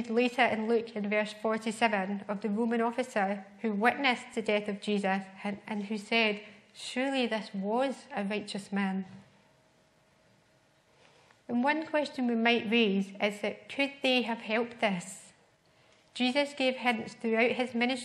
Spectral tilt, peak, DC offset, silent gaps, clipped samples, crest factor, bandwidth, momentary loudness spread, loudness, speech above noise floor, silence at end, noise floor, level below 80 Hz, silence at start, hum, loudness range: -5 dB/octave; -10 dBFS; under 0.1%; none; under 0.1%; 22 dB; 12.5 kHz; 10 LU; -30 LUFS; 36 dB; 0 s; -66 dBFS; -80 dBFS; 0 s; none; 7 LU